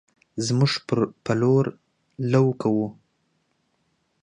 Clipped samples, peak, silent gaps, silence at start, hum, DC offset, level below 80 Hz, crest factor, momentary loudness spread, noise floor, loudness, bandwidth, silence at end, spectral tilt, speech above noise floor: under 0.1%; -6 dBFS; none; 0.35 s; none; under 0.1%; -64 dBFS; 18 dB; 10 LU; -70 dBFS; -23 LUFS; 10.5 kHz; 1.3 s; -6.5 dB/octave; 49 dB